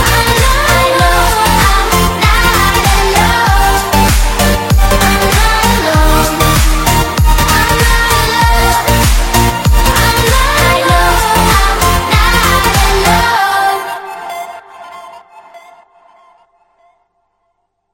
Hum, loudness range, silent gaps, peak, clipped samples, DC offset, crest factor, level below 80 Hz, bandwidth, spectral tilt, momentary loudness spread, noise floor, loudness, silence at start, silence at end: none; 5 LU; none; 0 dBFS; under 0.1%; under 0.1%; 10 dB; -14 dBFS; 17 kHz; -3.5 dB/octave; 3 LU; -64 dBFS; -9 LUFS; 0 s; 2.35 s